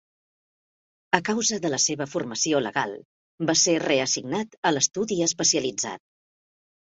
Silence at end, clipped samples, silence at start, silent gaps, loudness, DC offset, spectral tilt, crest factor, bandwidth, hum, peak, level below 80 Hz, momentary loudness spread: 0.9 s; under 0.1%; 1.15 s; 3.05-3.38 s, 4.58-4.63 s; -24 LUFS; under 0.1%; -2.5 dB/octave; 24 dB; 8 kHz; none; -2 dBFS; -68 dBFS; 10 LU